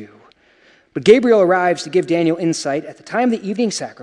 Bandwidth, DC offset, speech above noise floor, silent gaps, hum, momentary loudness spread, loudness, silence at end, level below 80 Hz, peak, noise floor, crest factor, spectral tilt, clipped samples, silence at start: 11.5 kHz; under 0.1%; 37 dB; none; none; 11 LU; -16 LUFS; 0 s; -62 dBFS; 0 dBFS; -53 dBFS; 18 dB; -5 dB/octave; under 0.1%; 0 s